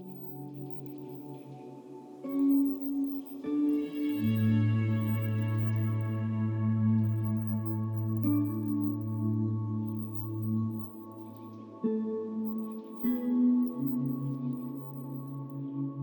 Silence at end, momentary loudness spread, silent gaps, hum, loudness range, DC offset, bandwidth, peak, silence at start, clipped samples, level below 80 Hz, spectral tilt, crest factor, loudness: 0 s; 16 LU; none; none; 5 LU; under 0.1%; 19.5 kHz; -18 dBFS; 0 s; under 0.1%; -72 dBFS; -10.5 dB/octave; 14 dB; -32 LUFS